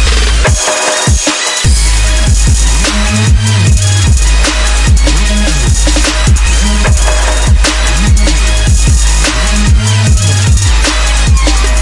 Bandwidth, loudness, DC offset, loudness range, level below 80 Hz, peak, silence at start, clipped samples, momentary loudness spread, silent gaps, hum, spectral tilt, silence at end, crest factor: 11.5 kHz; -9 LUFS; under 0.1%; 0 LU; -10 dBFS; 0 dBFS; 0 s; under 0.1%; 1 LU; none; none; -3.5 dB/octave; 0 s; 8 dB